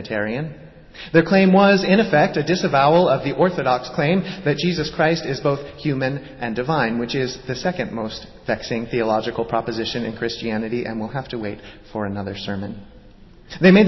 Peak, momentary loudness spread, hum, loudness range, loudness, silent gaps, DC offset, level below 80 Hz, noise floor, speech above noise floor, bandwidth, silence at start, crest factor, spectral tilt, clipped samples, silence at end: -2 dBFS; 14 LU; none; 9 LU; -20 LUFS; none; under 0.1%; -48 dBFS; -45 dBFS; 25 dB; 6.2 kHz; 0 s; 18 dB; -6.5 dB/octave; under 0.1%; 0 s